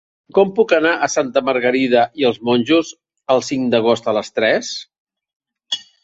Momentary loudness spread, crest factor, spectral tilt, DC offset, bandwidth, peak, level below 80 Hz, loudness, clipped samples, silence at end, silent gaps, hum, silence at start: 10 LU; 16 dB; -4 dB/octave; under 0.1%; 8 kHz; -2 dBFS; -60 dBFS; -17 LUFS; under 0.1%; 0.2 s; 5.00-5.07 s, 5.36-5.40 s; none; 0.35 s